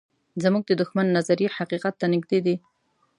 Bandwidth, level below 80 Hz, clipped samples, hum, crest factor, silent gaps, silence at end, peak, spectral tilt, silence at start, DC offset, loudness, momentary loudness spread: 11 kHz; -72 dBFS; under 0.1%; none; 16 dB; none; 0.6 s; -8 dBFS; -6.5 dB/octave; 0.35 s; under 0.1%; -24 LUFS; 5 LU